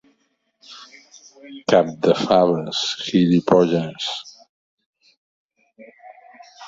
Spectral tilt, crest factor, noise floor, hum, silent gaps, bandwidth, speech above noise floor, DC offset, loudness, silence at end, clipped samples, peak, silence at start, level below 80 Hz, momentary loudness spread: -5.5 dB/octave; 20 dB; -68 dBFS; none; 4.49-4.78 s, 4.86-4.93 s, 5.17-5.49 s; 7.8 kHz; 50 dB; under 0.1%; -19 LUFS; 0 s; under 0.1%; -2 dBFS; 0.7 s; -60 dBFS; 22 LU